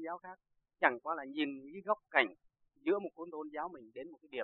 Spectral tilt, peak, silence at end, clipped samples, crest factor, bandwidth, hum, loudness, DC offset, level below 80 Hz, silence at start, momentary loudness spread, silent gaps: -1 dB/octave; -12 dBFS; 0 s; under 0.1%; 26 dB; 4.4 kHz; none; -37 LUFS; under 0.1%; -84 dBFS; 0 s; 16 LU; none